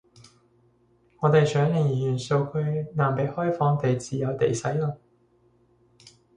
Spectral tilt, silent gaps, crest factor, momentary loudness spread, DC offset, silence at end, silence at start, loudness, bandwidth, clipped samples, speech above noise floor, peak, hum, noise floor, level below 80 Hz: -7 dB/octave; none; 18 dB; 7 LU; under 0.1%; 0.25 s; 1.2 s; -25 LUFS; 10 kHz; under 0.1%; 39 dB; -8 dBFS; 60 Hz at -50 dBFS; -63 dBFS; -60 dBFS